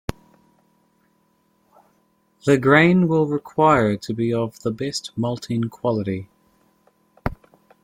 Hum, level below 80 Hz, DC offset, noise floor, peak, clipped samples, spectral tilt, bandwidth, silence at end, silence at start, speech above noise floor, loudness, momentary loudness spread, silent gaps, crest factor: none; -48 dBFS; under 0.1%; -64 dBFS; -2 dBFS; under 0.1%; -6.5 dB/octave; 16 kHz; 0.5 s; 0.1 s; 45 dB; -20 LUFS; 17 LU; none; 20 dB